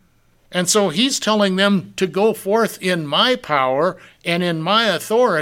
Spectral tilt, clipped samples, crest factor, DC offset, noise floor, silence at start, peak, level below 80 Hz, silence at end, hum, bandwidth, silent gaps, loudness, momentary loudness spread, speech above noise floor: -3.5 dB/octave; under 0.1%; 16 dB; under 0.1%; -56 dBFS; 0.5 s; -2 dBFS; -60 dBFS; 0 s; none; 17 kHz; none; -18 LUFS; 6 LU; 38 dB